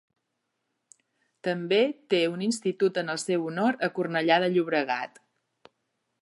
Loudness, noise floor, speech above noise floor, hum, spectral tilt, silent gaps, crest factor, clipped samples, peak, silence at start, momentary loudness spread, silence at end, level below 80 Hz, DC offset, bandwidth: -26 LUFS; -80 dBFS; 54 dB; none; -4.5 dB/octave; none; 20 dB; under 0.1%; -8 dBFS; 1.45 s; 8 LU; 1.15 s; -82 dBFS; under 0.1%; 11.5 kHz